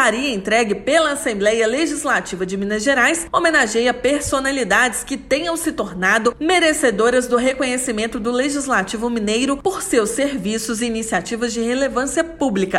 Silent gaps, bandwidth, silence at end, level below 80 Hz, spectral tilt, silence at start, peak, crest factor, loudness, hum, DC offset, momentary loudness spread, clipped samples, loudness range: none; 16 kHz; 0 s; -44 dBFS; -3 dB/octave; 0 s; -4 dBFS; 14 dB; -18 LUFS; none; under 0.1%; 6 LU; under 0.1%; 3 LU